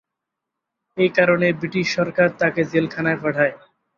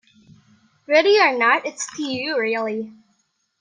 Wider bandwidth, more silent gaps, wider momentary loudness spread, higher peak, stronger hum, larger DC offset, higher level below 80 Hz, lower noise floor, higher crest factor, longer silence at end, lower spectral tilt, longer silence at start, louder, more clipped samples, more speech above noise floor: second, 7.2 kHz vs 10 kHz; neither; second, 5 LU vs 13 LU; about the same, -2 dBFS vs -2 dBFS; neither; neither; first, -62 dBFS vs -74 dBFS; first, -82 dBFS vs -68 dBFS; about the same, 18 dB vs 20 dB; second, 0.4 s vs 0.7 s; first, -6 dB/octave vs -2.5 dB/octave; about the same, 0.95 s vs 0.9 s; about the same, -19 LUFS vs -19 LUFS; neither; first, 63 dB vs 49 dB